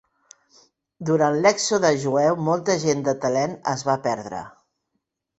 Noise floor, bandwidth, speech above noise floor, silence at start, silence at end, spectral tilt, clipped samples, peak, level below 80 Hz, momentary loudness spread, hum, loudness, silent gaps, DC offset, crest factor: -78 dBFS; 8.4 kHz; 56 dB; 1 s; 0.9 s; -4.5 dB/octave; under 0.1%; -4 dBFS; -62 dBFS; 9 LU; none; -22 LUFS; none; under 0.1%; 20 dB